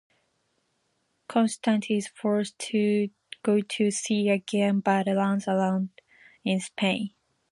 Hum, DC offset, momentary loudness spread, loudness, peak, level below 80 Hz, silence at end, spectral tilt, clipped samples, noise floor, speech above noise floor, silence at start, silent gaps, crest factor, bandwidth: none; under 0.1%; 6 LU; -26 LUFS; -8 dBFS; -74 dBFS; 0.45 s; -5 dB/octave; under 0.1%; -74 dBFS; 48 dB; 1.3 s; none; 18 dB; 11.5 kHz